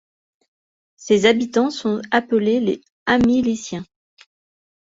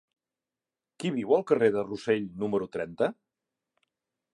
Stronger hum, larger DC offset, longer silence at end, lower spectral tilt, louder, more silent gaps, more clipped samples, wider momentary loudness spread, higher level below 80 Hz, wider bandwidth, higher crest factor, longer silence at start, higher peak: neither; neither; second, 1.05 s vs 1.2 s; second, -5 dB/octave vs -6.5 dB/octave; first, -19 LUFS vs -28 LUFS; first, 2.92-3.06 s vs none; neither; first, 11 LU vs 8 LU; first, -52 dBFS vs -70 dBFS; second, 7.8 kHz vs 11.5 kHz; about the same, 20 dB vs 20 dB; about the same, 1 s vs 1 s; first, -2 dBFS vs -10 dBFS